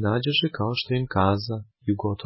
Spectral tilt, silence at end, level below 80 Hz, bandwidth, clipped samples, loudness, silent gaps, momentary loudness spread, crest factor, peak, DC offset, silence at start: -10 dB/octave; 0 s; -46 dBFS; 5.8 kHz; under 0.1%; -25 LUFS; none; 7 LU; 16 dB; -8 dBFS; under 0.1%; 0 s